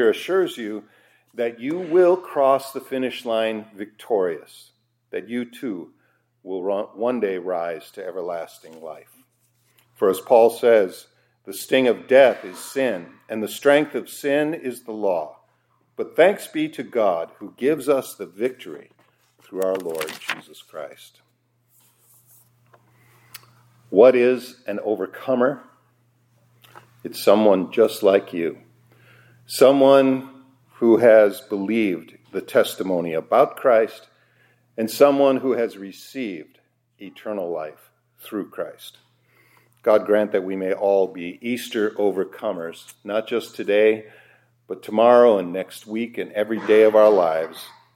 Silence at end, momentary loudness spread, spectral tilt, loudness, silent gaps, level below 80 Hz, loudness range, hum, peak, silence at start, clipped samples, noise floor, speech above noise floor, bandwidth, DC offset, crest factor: 0.25 s; 20 LU; -5 dB/octave; -20 LUFS; none; -78 dBFS; 11 LU; none; 0 dBFS; 0 s; under 0.1%; -66 dBFS; 46 dB; 16.5 kHz; under 0.1%; 20 dB